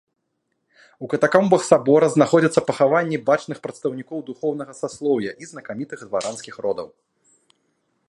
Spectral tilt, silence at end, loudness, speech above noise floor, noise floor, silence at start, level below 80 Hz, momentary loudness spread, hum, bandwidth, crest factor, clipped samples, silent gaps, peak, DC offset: -5.5 dB/octave; 1.25 s; -20 LUFS; 54 dB; -74 dBFS; 1 s; -66 dBFS; 16 LU; none; 11.5 kHz; 22 dB; under 0.1%; none; 0 dBFS; under 0.1%